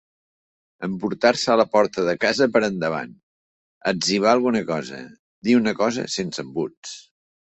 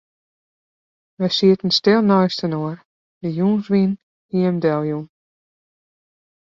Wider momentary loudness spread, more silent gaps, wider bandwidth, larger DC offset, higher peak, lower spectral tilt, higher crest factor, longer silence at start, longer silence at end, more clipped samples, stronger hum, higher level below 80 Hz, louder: about the same, 15 LU vs 14 LU; first, 3.23-3.81 s, 5.19-5.42 s, 6.77-6.83 s vs 2.85-3.21 s, 4.03-4.29 s; first, 8.4 kHz vs 7.4 kHz; neither; about the same, -2 dBFS vs -2 dBFS; second, -4.5 dB/octave vs -7 dB/octave; about the same, 20 dB vs 18 dB; second, 0.8 s vs 1.2 s; second, 0.55 s vs 1.4 s; neither; neither; about the same, -62 dBFS vs -62 dBFS; about the same, -21 LUFS vs -19 LUFS